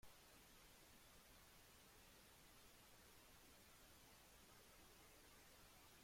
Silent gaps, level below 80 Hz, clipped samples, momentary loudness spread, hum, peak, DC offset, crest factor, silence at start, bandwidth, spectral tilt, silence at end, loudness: none; -78 dBFS; under 0.1%; 0 LU; none; -52 dBFS; under 0.1%; 16 dB; 0 s; 16.5 kHz; -2.5 dB/octave; 0 s; -67 LUFS